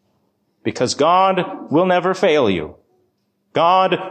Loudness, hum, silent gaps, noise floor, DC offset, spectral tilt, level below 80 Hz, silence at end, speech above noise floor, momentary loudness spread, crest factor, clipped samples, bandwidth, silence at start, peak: -17 LUFS; none; none; -66 dBFS; under 0.1%; -5 dB/octave; -54 dBFS; 0 s; 50 dB; 11 LU; 14 dB; under 0.1%; 9.2 kHz; 0.65 s; -4 dBFS